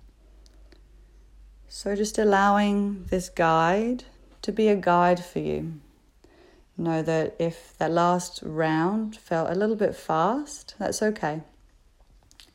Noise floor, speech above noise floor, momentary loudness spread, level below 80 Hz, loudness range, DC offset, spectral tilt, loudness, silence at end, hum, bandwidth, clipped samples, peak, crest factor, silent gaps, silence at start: -57 dBFS; 33 dB; 12 LU; -52 dBFS; 4 LU; under 0.1%; -5.5 dB/octave; -25 LUFS; 1.1 s; none; 16 kHz; under 0.1%; -8 dBFS; 18 dB; none; 1.4 s